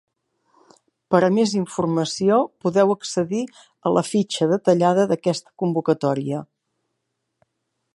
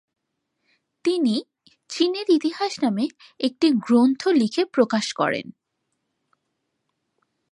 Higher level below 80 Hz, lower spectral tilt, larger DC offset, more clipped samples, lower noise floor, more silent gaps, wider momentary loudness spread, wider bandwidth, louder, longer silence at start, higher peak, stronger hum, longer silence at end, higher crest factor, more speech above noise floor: first, -66 dBFS vs -74 dBFS; about the same, -6 dB/octave vs -5 dB/octave; neither; neither; about the same, -77 dBFS vs -77 dBFS; neither; about the same, 8 LU vs 10 LU; about the same, 11.5 kHz vs 11.5 kHz; about the same, -21 LUFS vs -22 LUFS; about the same, 1.1 s vs 1.05 s; first, -2 dBFS vs -6 dBFS; neither; second, 1.5 s vs 2 s; about the same, 20 dB vs 18 dB; about the same, 57 dB vs 56 dB